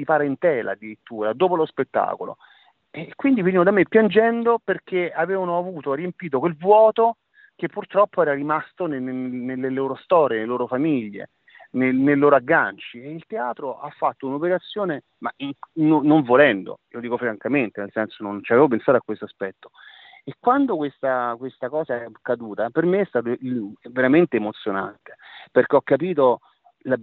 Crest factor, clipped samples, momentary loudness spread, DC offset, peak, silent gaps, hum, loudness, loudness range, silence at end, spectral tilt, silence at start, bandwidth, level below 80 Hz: 20 dB; under 0.1%; 15 LU; under 0.1%; -2 dBFS; none; none; -21 LUFS; 4 LU; 0 s; -5 dB/octave; 0 s; 4.3 kHz; -70 dBFS